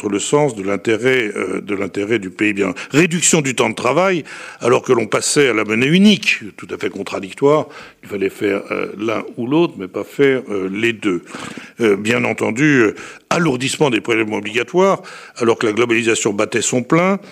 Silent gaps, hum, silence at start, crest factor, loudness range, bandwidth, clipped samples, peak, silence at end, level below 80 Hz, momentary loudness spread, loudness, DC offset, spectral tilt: none; none; 0 s; 16 dB; 4 LU; 15.5 kHz; under 0.1%; -2 dBFS; 0 s; -62 dBFS; 10 LU; -16 LUFS; under 0.1%; -4 dB/octave